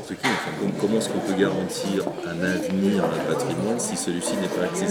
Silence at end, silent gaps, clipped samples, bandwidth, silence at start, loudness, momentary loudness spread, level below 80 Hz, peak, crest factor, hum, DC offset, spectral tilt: 0 s; none; under 0.1%; 18 kHz; 0 s; -24 LUFS; 4 LU; -62 dBFS; -6 dBFS; 18 dB; none; under 0.1%; -4.5 dB/octave